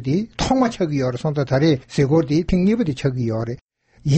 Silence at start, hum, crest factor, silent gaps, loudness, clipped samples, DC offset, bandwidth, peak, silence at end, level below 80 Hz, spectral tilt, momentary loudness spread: 0 s; none; 14 dB; 3.62-3.69 s; -20 LUFS; under 0.1%; under 0.1%; 8.6 kHz; -6 dBFS; 0 s; -38 dBFS; -7 dB/octave; 7 LU